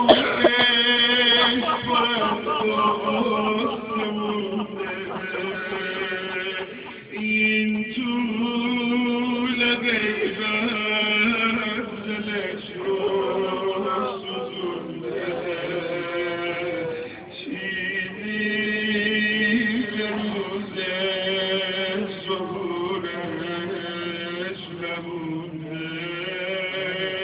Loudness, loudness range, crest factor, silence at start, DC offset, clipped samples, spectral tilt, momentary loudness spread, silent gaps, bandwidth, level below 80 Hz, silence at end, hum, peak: -23 LUFS; 8 LU; 24 dB; 0 s; under 0.1%; under 0.1%; -8 dB/octave; 11 LU; none; 4 kHz; -58 dBFS; 0 s; none; 0 dBFS